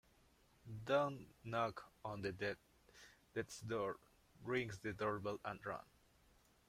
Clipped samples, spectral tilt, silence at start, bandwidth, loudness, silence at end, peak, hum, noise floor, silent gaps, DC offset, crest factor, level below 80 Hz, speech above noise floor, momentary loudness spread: under 0.1%; -5.5 dB/octave; 0.65 s; 16 kHz; -44 LUFS; 0.9 s; -24 dBFS; none; -72 dBFS; none; under 0.1%; 22 dB; -72 dBFS; 29 dB; 16 LU